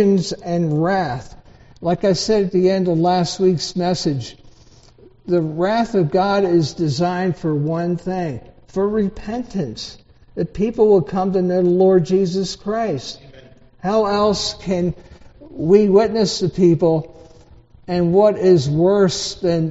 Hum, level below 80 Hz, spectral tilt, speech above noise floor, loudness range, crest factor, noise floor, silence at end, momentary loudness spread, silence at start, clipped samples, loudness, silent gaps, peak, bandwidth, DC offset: none; -46 dBFS; -6 dB/octave; 30 dB; 5 LU; 18 dB; -47 dBFS; 0 s; 13 LU; 0 s; under 0.1%; -18 LUFS; none; 0 dBFS; 8 kHz; under 0.1%